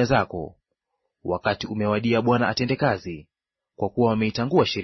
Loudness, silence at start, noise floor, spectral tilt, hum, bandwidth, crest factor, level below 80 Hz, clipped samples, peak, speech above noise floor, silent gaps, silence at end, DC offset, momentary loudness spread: -23 LUFS; 0 s; -79 dBFS; -6.5 dB/octave; none; 6.2 kHz; 18 dB; -52 dBFS; under 0.1%; -6 dBFS; 56 dB; none; 0 s; under 0.1%; 14 LU